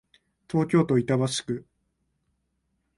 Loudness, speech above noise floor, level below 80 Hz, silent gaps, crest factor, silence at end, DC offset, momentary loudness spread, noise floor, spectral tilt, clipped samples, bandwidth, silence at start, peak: -25 LUFS; 51 dB; -62 dBFS; none; 18 dB; 1.35 s; under 0.1%; 11 LU; -75 dBFS; -6 dB/octave; under 0.1%; 11.5 kHz; 0.55 s; -10 dBFS